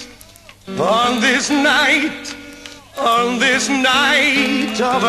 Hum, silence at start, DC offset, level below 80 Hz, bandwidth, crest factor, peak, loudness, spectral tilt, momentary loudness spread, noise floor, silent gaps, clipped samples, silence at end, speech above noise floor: none; 0 s; under 0.1%; -50 dBFS; 13 kHz; 14 dB; -2 dBFS; -14 LUFS; -2.5 dB/octave; 18 LU; -42 dBFS; none; under 0.1%; 0 s; 27 dB